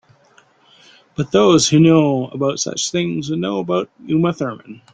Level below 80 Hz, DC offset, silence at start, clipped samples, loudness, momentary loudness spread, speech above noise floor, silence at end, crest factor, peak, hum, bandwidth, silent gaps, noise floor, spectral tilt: -54 dBFS; under 0.1%; 1.2 s; under 0.1%; -17 LUFS; 14 LU; 37 dB; 0.2 s; 16 dB; -2 dBFS; none; 9.4 kHz; none; -53 dBFS; -5 dB/octave